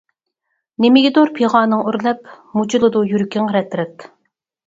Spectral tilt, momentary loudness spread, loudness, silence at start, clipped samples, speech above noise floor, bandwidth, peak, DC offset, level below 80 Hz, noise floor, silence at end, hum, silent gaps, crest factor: -6 dB/octave; 12 LU; -16 LUFS; 0.8 s; under 0.1%; 58 dB; 7.8 kHz; 0 dBFS; under 0.1%; -62 dBFS; -73 dBFS; 0.6 s; none; none; 16 dB